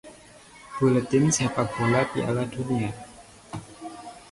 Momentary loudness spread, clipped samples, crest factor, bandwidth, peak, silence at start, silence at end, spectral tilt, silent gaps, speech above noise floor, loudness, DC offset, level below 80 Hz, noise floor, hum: 19 LU; under 0.1%; 18 dB; 11.5 kHz; -10 dBFS; 0.05 s; 0.1 s; -5.5 dB/octave; none; 26 dB; -24 LUFS; under 0.1%; -54 dBFS; -49 dBFS; none